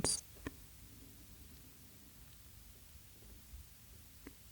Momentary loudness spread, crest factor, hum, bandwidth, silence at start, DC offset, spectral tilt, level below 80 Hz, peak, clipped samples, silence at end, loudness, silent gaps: 6 LU; 34 dB; none; over 20 kHz; 0 s; under 0.1%; -2 dB/octave; -62 dBFS; -16 dBFS; under 0.1%; 0 s; -50 LUFS; none